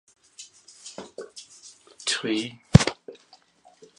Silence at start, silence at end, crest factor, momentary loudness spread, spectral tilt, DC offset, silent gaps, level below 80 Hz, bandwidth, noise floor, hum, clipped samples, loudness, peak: 0.4 s; 0.85 s; 28 dB; 27 LU; -5 dB/octave; under 0.1%; none; -44 dBFS; 11.5 kHz; -58 dBFS; none; under 0.1%; -23 LUFS; 0 dBFS